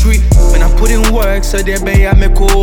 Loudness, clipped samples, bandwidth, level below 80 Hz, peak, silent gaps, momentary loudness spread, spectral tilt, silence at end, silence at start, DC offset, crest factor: -11 LUFS; under 0.1%; 19 kHz; -8 dBFS; 0 dBFS; none; 5 LU; -5 dB/octave; 0 s; 0 s; under 0.1%; 8 dB